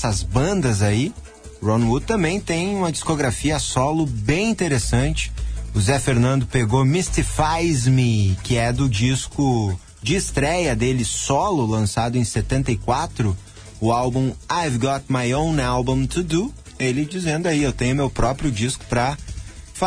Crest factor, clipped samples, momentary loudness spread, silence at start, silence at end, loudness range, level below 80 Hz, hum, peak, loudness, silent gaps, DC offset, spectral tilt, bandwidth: 16 dB; under 0.1%; 6 LU; 0 s; 0 s; 3 LU; -32 dBFS; none; -4 dBFS; -21 LUFS; none; under 0.1%; -5.5 dB/octave; 11 kHz